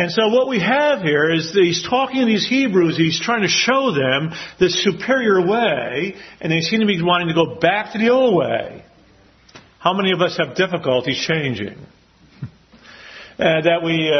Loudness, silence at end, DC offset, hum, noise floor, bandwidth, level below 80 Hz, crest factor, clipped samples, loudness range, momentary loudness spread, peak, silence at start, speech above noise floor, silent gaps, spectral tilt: -17 LUFS; 0 s; under 0.1%; none; -51 dBFS; 6.4 kHz; -56 dBFS; 18 dB; under 0.1%; 5 LU; 11 LU; 0 dBFS; 0 s; 33 dB; none; -4.5 dB/octave